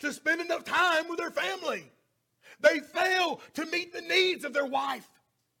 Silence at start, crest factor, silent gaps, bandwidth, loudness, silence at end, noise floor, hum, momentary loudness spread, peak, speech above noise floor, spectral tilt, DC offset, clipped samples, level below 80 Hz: 0 s; 22 dB; none; 17.5 kHz; -28 LUFS; 0.6 s; -63 dBFS; none; 10 LU; -8 dBFS; 34 dB; -2 dB/octave; under 0.1%; under 0.1%; -78 dBFS